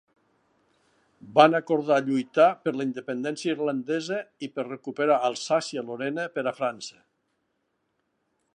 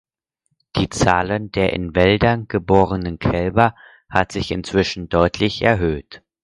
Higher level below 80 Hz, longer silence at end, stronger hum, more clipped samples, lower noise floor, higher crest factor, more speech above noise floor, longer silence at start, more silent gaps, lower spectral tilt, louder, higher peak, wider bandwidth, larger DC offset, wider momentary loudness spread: second, -82 dBFS vs -36 dBFS; first, 1.65 s vs 0.25 s; neither; neither; first, -76 dBFS vs -72 dBFS; first, 24 dB vs 18 dB; second, 50 dB vs 54 dB; first, 1.25 s vs 0.75 s; neither; about the same, -5 dB/octave vs -6 dB/octave; second, -26 LUFS vs -19 LUFS; second, -4 dBFS vs 0 dBFS; about the same, 10.5 kHz vs 11.5 kHz; neither; first, 14 LU vs 6 LU